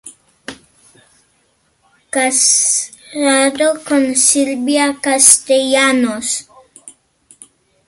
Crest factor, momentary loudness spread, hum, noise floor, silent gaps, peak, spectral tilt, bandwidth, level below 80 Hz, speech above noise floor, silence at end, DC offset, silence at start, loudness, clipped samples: 16 dB; 14 LU; none; -59 dBFS; none; 0 dBFS; -0.5 dB/octave; 16 kHz; -60 dBFS; 46 dB; 0.95 s; under 0.1%; 0.05 s; -12 LUFS; under 0.1%